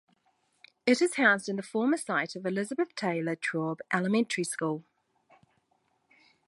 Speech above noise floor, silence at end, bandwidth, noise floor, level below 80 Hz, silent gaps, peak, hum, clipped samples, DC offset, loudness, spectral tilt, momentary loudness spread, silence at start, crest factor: 45 dB; 1.65 s; 11.5 kHz; -73 dBFS; -82 dBFS; none; -10 dBFS; none; under 0.1%; under 0.1%; -29 LUFS; -4.5 dB/octave; 9 LU; 0.85 s; 22 dB